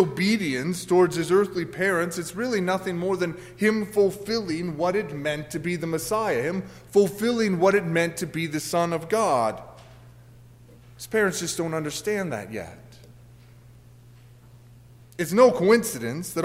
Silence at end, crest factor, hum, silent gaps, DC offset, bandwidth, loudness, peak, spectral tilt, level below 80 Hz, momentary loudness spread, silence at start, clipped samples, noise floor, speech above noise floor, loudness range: 0 s; 20 dB; 60 Hz at -50 dBFS; none; under 0.1%; 16 kHz; -24 LUFS; -6 dBFS; -5 dB/octave; -58 dBFS; 9 LU; 0 s; under 0.1%; -50 dBFS; 26 dB; 6 LU